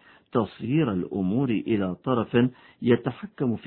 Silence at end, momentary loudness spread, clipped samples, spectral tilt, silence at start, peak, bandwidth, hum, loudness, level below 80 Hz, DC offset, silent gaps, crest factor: 0 s; 6 LU; under 0.1%; -11.5 dB/octave; 0.35 s; -6 dBFS; 4.3 kHz; none; -26 LUFS; -60 dBFS; under 0.1%; none; 18 dB